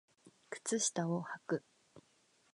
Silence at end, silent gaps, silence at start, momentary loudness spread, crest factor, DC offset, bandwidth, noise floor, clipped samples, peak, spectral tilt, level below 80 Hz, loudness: 0.55 s; none; 0.25 s; 9 LU; 18 dB; under 0.1%; 11 kHz; -72 dBFS; under 0.1%; -22 dBFS; -4 dB/octave; -88 dBFS; -38 LUFS